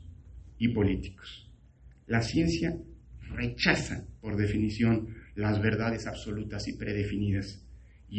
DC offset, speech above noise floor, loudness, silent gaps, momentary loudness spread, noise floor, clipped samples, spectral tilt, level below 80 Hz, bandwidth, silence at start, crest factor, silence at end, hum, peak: under 0.1%; 26 dB; -30 LUFS; none; 19 LU; -55 dBFS; under 0.1%; -6 dB/octave; -46 dBFS; 8.8 kHz; 0 s; 22 dB; 0 s; none; -8 dBFS